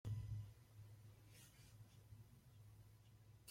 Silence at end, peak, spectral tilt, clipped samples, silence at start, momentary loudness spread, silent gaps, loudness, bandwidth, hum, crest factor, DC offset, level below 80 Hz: 0 s; -38 dBFS; -6 dB/octave; under 0.1%; 0.05 s; 15 LU; none; -59 LUFS; 16.5 kHz; none; 18 dB; under 0.1%; -68 dBFS